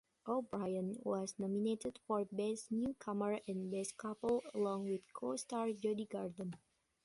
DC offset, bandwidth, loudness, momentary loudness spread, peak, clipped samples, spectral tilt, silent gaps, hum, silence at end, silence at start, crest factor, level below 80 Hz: under 0.1%; 11.5 kHz; -41 LUFS; 5 LU; -24 dBFS; under 0.1%; -6 dB/octave; none; none; 0.45 s; 0.25 s; 16 dB; -76 dBFS